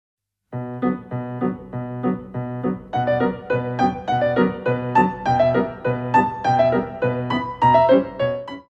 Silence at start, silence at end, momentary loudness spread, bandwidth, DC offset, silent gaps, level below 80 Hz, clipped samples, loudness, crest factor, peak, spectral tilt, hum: 0.5 s; 0.1 s; 11 LU; 8 kHz; under 0.1%; none; -50 dBFS; under 0.1%; -21 LUFS; 18 dB; -4 dBFS; -8 dB/octave; none